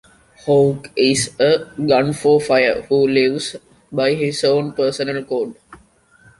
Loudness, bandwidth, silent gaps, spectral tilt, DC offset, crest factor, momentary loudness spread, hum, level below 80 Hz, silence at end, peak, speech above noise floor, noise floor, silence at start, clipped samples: -17 LUFS; 11.5 kHz; none; -4.5 dB/octave; under 0.1%; 16 dB; 10 LU; none; -54 dBFS; 0.65 s; -2 dBFS; 35 dB; -52 dBFS; 0.45 s; under 0.1%